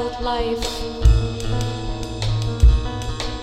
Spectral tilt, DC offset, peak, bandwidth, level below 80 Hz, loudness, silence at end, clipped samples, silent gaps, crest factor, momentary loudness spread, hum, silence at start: -5.5 dB/octave; under 0.1%; -2 dBFS; 12 kHz; -20 dBFS; -22 LUFS; 0 s; under 0.1%; none; 16 dB; 9 LU; none; 0 s